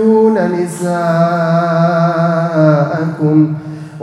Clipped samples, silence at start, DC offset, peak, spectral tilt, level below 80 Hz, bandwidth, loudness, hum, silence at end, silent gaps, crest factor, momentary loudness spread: under 0.1%; 0 s; under 0.1%; 0 dBFS; -8 dB/octave; -60 dBFS; 12 kHz; -13 LUFS; none; 0 s; none; 12 dB; 6 LU